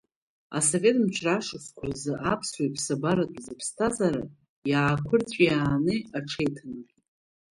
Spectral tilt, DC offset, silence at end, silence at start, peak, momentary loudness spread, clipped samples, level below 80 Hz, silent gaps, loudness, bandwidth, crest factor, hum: -4.5 dB/octave; under 0.1%; 0.7 s; 0.5 s; -8 dBFS; 13 LU; under 0.1%; -56 dBFS; 4.49-4.62 s; -27 LUFS; 11.5 kHz; 18 dB; none